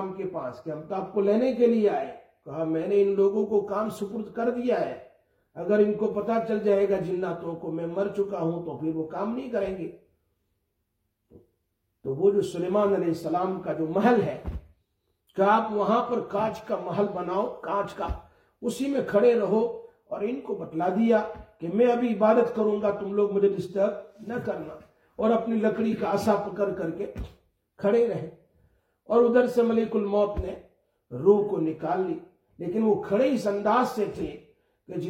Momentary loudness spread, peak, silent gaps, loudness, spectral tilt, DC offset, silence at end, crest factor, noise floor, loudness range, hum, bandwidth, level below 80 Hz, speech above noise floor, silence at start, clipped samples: 14 LU; -8 dBFS; none; -26 LUFS; -7.5 dB/octave; under 0.1%; 0 s; 18 dB; -77 dBFS; 4 LU; none; 15.5 kHz; -52 dBFS; 52 dB; 0 s; under 0.1%